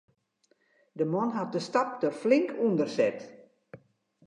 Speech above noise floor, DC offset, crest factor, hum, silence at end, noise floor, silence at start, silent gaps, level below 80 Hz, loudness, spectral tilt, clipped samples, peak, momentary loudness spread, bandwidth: 43 dB; under 0.1%; 20 dB; none; 0.5 s; -71 dBFS; 0.95 s; none; -82 dBFS; -28 LUFS; -6.5 dB/octave; under 0.1%; -10 dBFS; 12 LU; 10.5 kHz